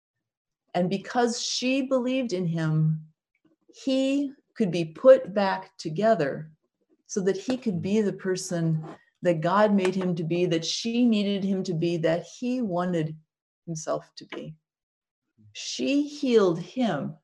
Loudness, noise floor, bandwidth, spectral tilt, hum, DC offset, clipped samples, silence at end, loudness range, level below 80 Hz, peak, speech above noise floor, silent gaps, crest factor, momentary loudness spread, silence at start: -26 LUFS; -70 dBFS; 12 kHz; -5.5 dB/octave; none; under 0.1%; under 0.1%; 0.1 s; 6 LU; -72 dBFS; -6 dBFS; 45 dB; 13.42-13.62 s, 14.83-15.01 s, 15.11-15.22 s; 20 dB; 13 LU; 0.75 s